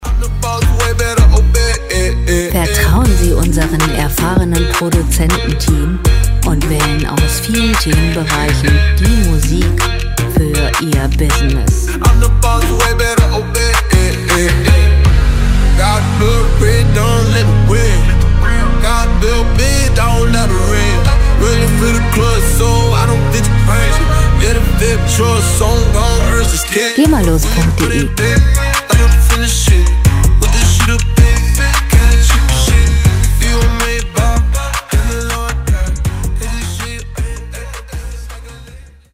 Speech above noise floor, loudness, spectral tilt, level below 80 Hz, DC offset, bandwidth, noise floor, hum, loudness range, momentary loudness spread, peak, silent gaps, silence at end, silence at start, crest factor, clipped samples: 25 dB; -12 LUFS; -5 dB/octave; -12 dBFS; under 0.1%; 16.5 kHz; -35 dBFS; none; 2 LU; 5 LU; 0 dBFS; none; 0.3 s; 0 s; 10 dB; under 0.1%